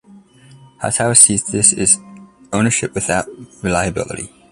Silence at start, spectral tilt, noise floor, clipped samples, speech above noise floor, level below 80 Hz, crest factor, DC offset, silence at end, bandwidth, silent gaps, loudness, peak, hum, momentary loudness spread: 0.15 s; -3 dB/octave; -44 dBFS; under 0.1%; 28 dB; -44 dBFS; 18 dB; under 0.1%; 0.25 s; 16 kHz; none; -14 LUFS; 0 dBFS; none; 17 LU